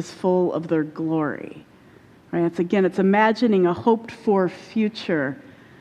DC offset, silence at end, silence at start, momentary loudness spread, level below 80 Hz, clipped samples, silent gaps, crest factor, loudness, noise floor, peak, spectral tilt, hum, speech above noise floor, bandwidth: under 0.1%; 0.4 s; 0 s; 10 LU; -62 dBFS; under 0.1%; none; 18 dB; -22 LUFS; -50 dBFS; -4 dBFS; -7.5 dB/octave; none; 29 dB; 9.8 kHz